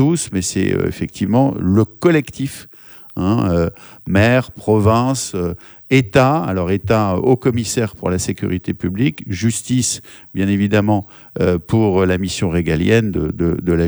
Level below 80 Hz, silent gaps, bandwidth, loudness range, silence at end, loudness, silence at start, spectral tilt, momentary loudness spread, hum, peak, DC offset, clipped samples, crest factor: -40 dBFS; none; over 20 kHz; 3 LU; 0 s; -17 LUFS; 0 s; -6 dB/octave; 9 LU; none; 0 dBFS; under 0.1%; under 0.1%; 16 dB